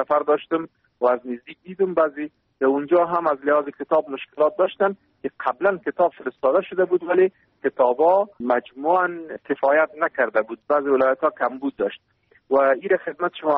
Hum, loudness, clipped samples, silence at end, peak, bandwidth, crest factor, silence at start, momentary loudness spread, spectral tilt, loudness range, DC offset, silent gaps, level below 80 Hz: none; -22 LUFS; under 0.1%; 0 s; -6 dBFS; 4.3 kHz; 16 dB; 0 s; 9 LU; -3.5 dB/octave; 2 LU; under 0.1%; none; -68 dBFS